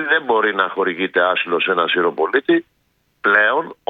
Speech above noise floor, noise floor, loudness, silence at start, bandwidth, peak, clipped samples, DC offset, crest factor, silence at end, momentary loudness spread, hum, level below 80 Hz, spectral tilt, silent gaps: 47 dB; -65 dBFS; -17 LUFS; 0 s; 4.7 kHz; 0 dBFS; under 0.1%; under 0.1%; 18 dB; 0.15 s; 5 LU; none; -68 dBFS; -6.5 dB/octave; none